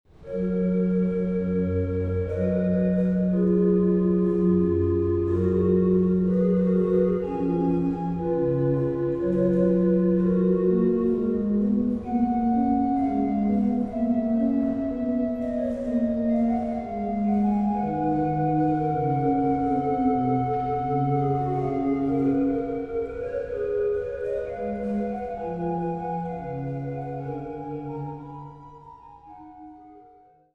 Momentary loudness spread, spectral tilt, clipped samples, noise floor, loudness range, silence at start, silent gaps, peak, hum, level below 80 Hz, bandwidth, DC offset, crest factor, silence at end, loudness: 9 LU; -11.5 dB/octave; under 0.1%; -54 dBFS; 8 LU; 0.2 s; none; -10 dBFS; none; -48 dBFS; 4 kHz; under 0.1%; 14 dB; 0.55 s; -24 LUFS